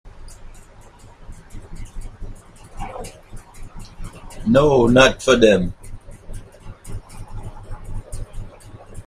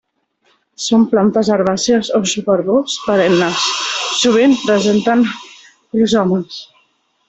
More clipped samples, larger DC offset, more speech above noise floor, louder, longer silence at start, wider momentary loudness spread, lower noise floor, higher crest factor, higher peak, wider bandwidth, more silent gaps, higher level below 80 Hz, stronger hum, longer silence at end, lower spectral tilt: neither; neither; second, 30 dB vs 47 dB; about the same, -15 LUFS vs -14 LUFS; second, 0.05 s vs 0.8 s; first, 27 LU vs 7 LU; second, -44 dBFS vs -60 dBFS; first, 22 dB vs 12 dB; about the same, 0 dBFS vs -2 dBFS; first, 14.5 kHz vs 8.2 kHz; neither; first, -34 dBFS vs -54 dBFS; neither; second, 0.05 s vs 0.65 s; about the same, -5 dB/octave vs -4 dB/octave